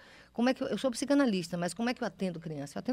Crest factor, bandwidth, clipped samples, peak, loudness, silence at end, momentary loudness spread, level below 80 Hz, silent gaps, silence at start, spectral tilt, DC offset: 16 dB; 15 kHz; under 0.1%; -16 dBFS; -32 LUFS; 0 s; 11 LU; -66 dBFS; none; 0.05 s; -5 dB/octave; under 0.1%